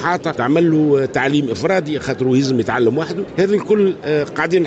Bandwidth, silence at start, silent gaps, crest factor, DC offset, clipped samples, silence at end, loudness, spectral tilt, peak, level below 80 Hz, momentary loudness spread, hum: 8.2 kHz; 0 s; none; 12 dB; under 0.1%; under 0.1%; 0 s; -17 LUFS; -6.5 dB/octave; -4 dBFS; -52 dBFS; 5 LU; none